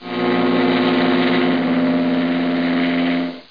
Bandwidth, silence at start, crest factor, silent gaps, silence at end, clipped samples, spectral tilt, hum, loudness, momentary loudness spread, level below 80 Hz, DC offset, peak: 5.2 kHz; 0 s; 14 dB; none; 0.1 s; under 0.1%; -8 dB/octave; none; -17 LUFS; 3 LU; -62 dBFS; 0.4%; -4 dBFS